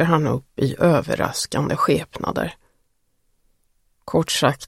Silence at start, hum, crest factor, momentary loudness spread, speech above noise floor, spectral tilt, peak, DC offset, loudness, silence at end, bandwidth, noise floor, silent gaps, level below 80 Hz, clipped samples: 0 s; none; 20 dB; 7 LU; 48 dB; -5 dB/octave; -2 dBFS; under 0.1%; -21 LUFS; 0 s; 16 kHz; -69 dBFS; none; -50 dBFS; under 0.1%